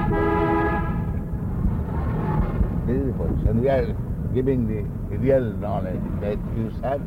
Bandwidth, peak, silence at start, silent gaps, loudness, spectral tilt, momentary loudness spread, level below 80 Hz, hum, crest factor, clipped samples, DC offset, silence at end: 16 kHz; -8 dBFS; 0 s; none; -24 LUFS; -10 dB/octave; 7 LU; -30 dBFS; none; 16 dB; under 0.1%; under 0.1%; 0 s